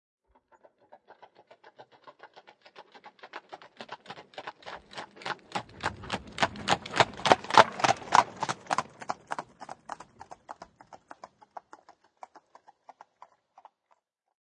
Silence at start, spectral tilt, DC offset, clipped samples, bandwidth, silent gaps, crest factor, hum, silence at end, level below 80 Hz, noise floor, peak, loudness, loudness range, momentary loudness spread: 1.8 s; -3 dB/octave; under 0.1%; under 0.1%; 11.5 kHz; none; 32 dB; none; 3.5 s; -66 dBFS; -72 dBFS; 0 dBFS; -28 LUFS; 23 LU; 27 LU